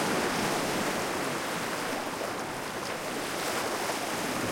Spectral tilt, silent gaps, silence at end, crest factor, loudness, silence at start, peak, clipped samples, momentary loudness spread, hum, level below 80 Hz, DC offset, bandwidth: -3 dB/octave; none; 0 s; 14 dB; -31 LUFS; 0 s; -16 dBFS; under 0.1%; 5 LU; none; -64 dBFS; under 0.1%; 16.5 kHz